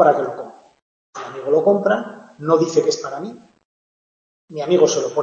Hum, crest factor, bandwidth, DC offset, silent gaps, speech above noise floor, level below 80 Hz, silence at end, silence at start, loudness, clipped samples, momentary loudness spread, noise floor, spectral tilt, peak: none; 18 dB; 7.6 kHz; under 0.1%; 0.82-1.13 s, 3.65-4.48 s; over 72 dB; -72 dBFS; 0 s; 0 s; -18 LUFS; under 0.1%; 19 LU; under -90 dBFS; -4.5 dB/octave; -2 dBFS